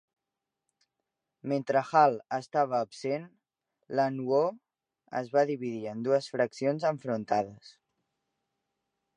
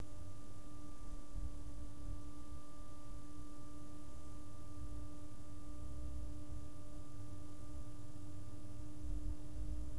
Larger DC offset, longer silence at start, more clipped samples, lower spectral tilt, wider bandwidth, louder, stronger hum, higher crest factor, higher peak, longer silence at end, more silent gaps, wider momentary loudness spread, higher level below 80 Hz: second, under 0.1% vs 1%; first, 1.45 s vs 0 s; neither; about the same, -6.5 dB/octave vs -6.5 dB/octave; about the same, 10 kHz vs 11 kHz; first, -30 LUFS vs -53 LUFS; neither; first, 22 dB vs 16 dB; first, -8 dBFS vs -30 dBFS; first, 1.45 s vs 0 s; neither; first, 10 LU vs 6 LU; second, -80 dBFS vs -52 dBFS